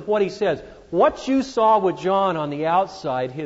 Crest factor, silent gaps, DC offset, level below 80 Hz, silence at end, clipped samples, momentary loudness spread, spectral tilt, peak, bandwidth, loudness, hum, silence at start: 14 dB; none; under 0.1%; -54 dBFS; 0 s; under 0.1%; 8 LU; -6 dB/octave; -6 dBFS; 8 kHz; -21 LUFS; none; 0 s